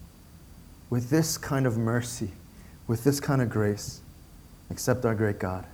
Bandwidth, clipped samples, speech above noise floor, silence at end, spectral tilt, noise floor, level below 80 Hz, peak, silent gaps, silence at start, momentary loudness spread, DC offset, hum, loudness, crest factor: over 20 kHz; under 0.1%; 23 dB; 0 s; -5.5 dB/octave; -50 dBFS; -52 dBFS; -8 dBFS; none; 0 s; 14 LU; under 0.1%; none; -28 LUFS; 20 dB